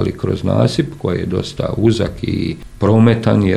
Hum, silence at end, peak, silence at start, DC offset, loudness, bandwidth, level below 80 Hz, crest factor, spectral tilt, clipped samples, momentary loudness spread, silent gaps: none; 0 s; 0 dBFS; 0 s; under 0.1%; -16 LUFS; 11.5 kHz; -38 dBFS; 14 dB; -7.5 dB/octave; under 0.1%; 9 LU; none